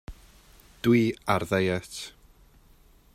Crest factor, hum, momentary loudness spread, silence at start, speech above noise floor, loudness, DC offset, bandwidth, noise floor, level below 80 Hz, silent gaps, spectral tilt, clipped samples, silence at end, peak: 20 dB; none; 16 LU; 0.1 s; 32 dB; -26 LUFS; under 0.1%; 16 kHz; -57 dBFS; -54 dBFS; none; -6 dB/octave; under 0.1%; 1.05 s; -10 dBFS